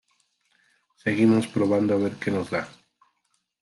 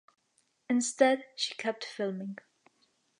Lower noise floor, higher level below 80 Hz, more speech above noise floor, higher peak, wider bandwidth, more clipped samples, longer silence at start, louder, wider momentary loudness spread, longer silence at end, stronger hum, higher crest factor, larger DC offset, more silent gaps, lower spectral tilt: about the same, -74 dBFS vs -74 dBFS; first, -68 dBFS vs -88 dBFS; first, 51 dB vs 43 dB; about the same, -8 dBFS vs -10 dBFS; about the same, 12 kHz vs 11 kHz; neither; first, 1.05 s vs 0.7 s; first, -24 LUFS vs -31 LUFS; second, 11 LU vs 15 LU; about the same, 0.95 s vs 0.85 s; neither; about the same, 18 dB vs 22 dB; neither; neither; first, -7 dB/octave vs -3 dB/octave